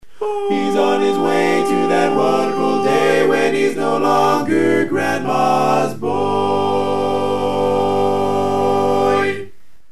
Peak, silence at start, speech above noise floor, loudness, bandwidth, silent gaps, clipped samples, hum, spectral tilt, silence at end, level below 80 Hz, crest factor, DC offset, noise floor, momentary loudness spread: -2 dBFS; 0 s; 22 dB; -16 LUFS; 13.5 kHz; none; under 0.1%; none; -5.5 dB/octave; 0 s; -58 dBFS; 14 dB; 3%; -38 dBFS; 4 LU